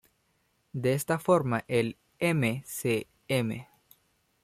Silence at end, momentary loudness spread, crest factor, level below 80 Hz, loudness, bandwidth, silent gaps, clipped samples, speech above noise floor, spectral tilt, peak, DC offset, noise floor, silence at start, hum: 0.8 s; 9 LU; 20 dB; -66 dBFS; -29 LUFS; 15.5 kHz; none; under 0.1%; 44 dB; -5.5 dB/octave; -10 dBFS; under 0.1%; -72 dBFS; 0.75 s; none